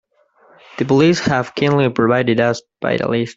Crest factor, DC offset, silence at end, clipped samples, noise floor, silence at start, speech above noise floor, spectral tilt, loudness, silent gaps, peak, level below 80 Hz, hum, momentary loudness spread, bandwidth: 14 dB; under 0.1%; 0.05 s; under 0.1%; -53 dBFS; 0.75 s; 38 dB; -6 dB/octave; -16 LUFS; none; -2 dBFS; -52 dBFS; none; 9 LU; 8 kHz